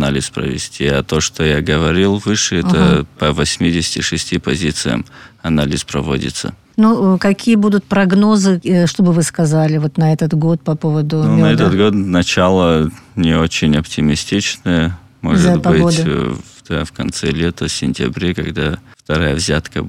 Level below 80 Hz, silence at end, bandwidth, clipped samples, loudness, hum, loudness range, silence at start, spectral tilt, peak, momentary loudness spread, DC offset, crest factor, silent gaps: -34 dBFS; 0 s; 14 kHz; under 0.1%; -15 LUFS; none; 4 LU; 0 s; -5.5 dB/octave; -2 dBFS; 8 LU; under 0.1%; 12 dB; none